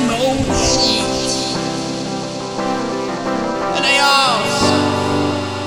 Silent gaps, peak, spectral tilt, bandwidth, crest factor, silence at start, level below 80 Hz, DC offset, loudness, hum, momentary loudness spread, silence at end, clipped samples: none; 0 dBFS; -3.5 dB/octave; 19 kHz; 16 dB; 0 s; -38 dBFS; under 0.1%; -16 LUFS; none; 10 LU; 0 s; under 0.1%